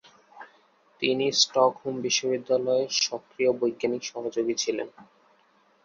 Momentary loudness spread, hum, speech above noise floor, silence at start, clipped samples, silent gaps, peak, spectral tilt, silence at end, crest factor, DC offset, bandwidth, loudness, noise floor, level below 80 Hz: 10 LU; none; 37 dB; 0.35 s; under 0.1%; none; -6 dBFS; -2.5 dB/octave; 0.8 s; 20 dB; under 0.1%; 7.6 kHz; -26 LUFS; -63 dBFS; -74 dBFS